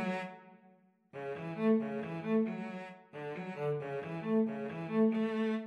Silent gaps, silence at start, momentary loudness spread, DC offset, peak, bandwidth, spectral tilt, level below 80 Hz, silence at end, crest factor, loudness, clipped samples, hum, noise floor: none; 0 s; 15 LU; under 0.1%; -20 dBFS; 6.2 kHz; -8.5 dB/octave; -88 dBFS; 0 s; 16 dB; -35 LUFS; under 0.1%; none; -65 dBFS